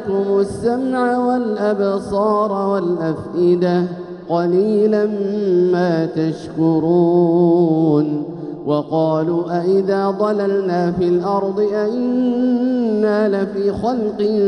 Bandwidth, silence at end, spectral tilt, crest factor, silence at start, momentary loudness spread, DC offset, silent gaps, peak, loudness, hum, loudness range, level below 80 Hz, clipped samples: 10.5 kHz; 0 s; -8.5 dB/octave; 12 dB; 0 s; 6 LU; under 0.1%; none; -4 dBFS; -17 LUFS; none; 2 LU; -52 dBFS; under 0.1%